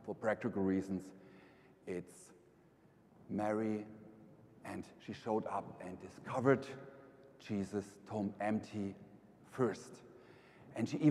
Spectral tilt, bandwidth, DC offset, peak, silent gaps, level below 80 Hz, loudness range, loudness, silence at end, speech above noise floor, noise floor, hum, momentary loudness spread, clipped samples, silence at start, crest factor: -7 dB/octave; 12.5 kHz; under 0.1%; -16 dBFS; none; -78 dBFS; 5 LU; -40 LUFS; 0 s; 28 dB; -66 dBFS; none; 23 LU; under 0.1%; 0 s; 24 dB